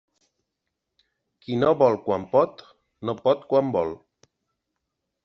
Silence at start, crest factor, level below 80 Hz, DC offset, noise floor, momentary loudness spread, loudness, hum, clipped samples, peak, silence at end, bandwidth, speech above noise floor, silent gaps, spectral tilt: 1.5 s; 20 dB; -66 dBFS; under 0.1%; -82 dBFS; 13 LU; -23 LUFS; none; under 0.1%; -6 dBFS; 1.3 s; 6.4 kHz; 59 dB; none; -6 dB/octave